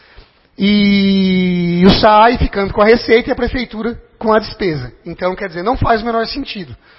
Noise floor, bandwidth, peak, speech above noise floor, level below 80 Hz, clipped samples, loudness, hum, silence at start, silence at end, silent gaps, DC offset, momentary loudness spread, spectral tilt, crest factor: -44 dBFS; 5.8 kHz; 0 dBFS; 31 dB; -30 dBFS; under 0.1%; -13 LUFS; none; 0.6 s; 0.25 s; none; under 0.1%; 13 LU; -9 dB/octave; 14 dB